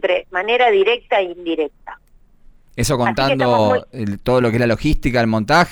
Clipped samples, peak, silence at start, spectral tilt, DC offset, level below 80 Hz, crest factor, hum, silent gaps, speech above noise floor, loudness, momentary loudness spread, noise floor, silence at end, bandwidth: under 0.1%; -4 dBFS; 0.05 s; -5.5 dB/octave; under 0.1%; -32 dBFS; 12 dB; none; none; 32 dB; -17 LUFS; 9 LU; -49 dBFS; 0 s; 20 kHz